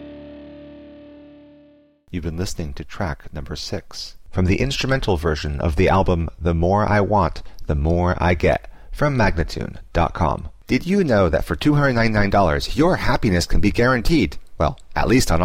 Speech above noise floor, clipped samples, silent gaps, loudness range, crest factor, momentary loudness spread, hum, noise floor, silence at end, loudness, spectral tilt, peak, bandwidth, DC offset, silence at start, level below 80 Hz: 33 dB; under 0.1%; none; 12 LU; 14 dB; 14 LU; none; -52 dBFS; 0 s; -20 LUFS; -6 dB/octave; -6 dBFS; 16 kHz; under 0.1%; 0 s; -28 dBFS